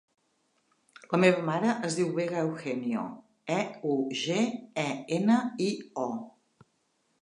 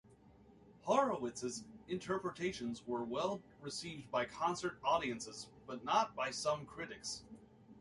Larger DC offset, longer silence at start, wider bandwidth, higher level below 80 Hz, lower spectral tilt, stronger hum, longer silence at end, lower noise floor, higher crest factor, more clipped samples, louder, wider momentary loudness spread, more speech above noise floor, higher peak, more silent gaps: neither; first, 1.1 s vs 0.05 s; about the same, 11 kHz vs 11.5 kHz; second, -78 dBFS vs -70 dBFS; first, -5.5 dB/octave vs -4 dB/octave; neither; first, 0.9 s vs 0 s; first, -74 dBFS vs -63 dBFS; about the same, 22 dB vs 22 dB; neither; first, -29 LUFS vs -39 LUFS; second, 10 LU vs 13 LU; first, 45 dB vs 24 dB; first, -8 dBFS vs -18 dBFS; neither